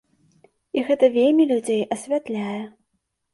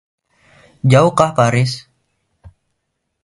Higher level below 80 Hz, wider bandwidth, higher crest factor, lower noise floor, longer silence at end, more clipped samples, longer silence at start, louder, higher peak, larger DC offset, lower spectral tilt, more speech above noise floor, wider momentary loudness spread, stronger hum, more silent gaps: second, -70 dBFS vs -48 dBFS; about the same, 11.5 kHz vs 11.5 kHz; about the same, 18 dB vs 18 dB; about the same, -74 dBFS vs -72 dBFS; second, 0.65 s vs 1.45 s; neither; about the same, 0.75 s vs 0.85 s; second, -21 LUFS vs -14 LUFS; second, -6 dBFS vs 0 dBFS; neither; about the same, -5.5 dB/octave vs -6 dB/octave; second, 54 dB vs 60 dB; first, 13 LU vs 9 LU; neither; neither